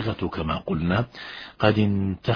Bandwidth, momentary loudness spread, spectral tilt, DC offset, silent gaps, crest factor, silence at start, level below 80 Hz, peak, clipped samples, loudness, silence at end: 5.4 kHz; 12 LU; -8.5 dB/octave; under 0.1%; none; 22 dB; 0 s; -44 dBFS; -2 dBFS; under 0.1%; -25 LUFS; 0 s